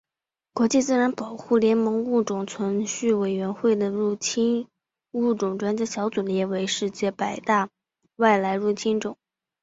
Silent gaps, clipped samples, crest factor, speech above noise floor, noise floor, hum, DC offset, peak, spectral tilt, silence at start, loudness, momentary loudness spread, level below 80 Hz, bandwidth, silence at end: none; under 0.1%; 18 dB; 65 dB; -88 dBFS; none; under 0.1%; -6 dBFS; -4.5 dB/octave; 0.55 s; -24 LUFS; 8 LU; -68 dBFS; 8 kHz; 0.5 s